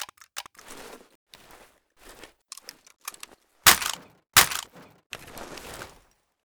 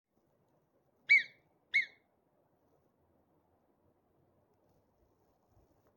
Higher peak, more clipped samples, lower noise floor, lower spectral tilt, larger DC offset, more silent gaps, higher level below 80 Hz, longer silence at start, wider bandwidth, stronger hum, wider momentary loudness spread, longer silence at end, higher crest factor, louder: first, -4 dBFS vs -16 dBFS; neither; second, -62 dBFS vs -75 dBFS; about the same, 0.5 dB/octave vs 0 dB/octave; neither; first, 1.15-1.27 s, 5.06-5.10 s vs none; first, -54 dBFS vs -86 dBFS; second, 0 s vs 1.1 s; first, over 20 kHz vs 17 kHz; neither; first, 27 LU vs 17 LU; second, 0.6 s vs 4.1 s; about the same, 24 dB vs 24 dB; first, -20 LUFS vs -29 LUFS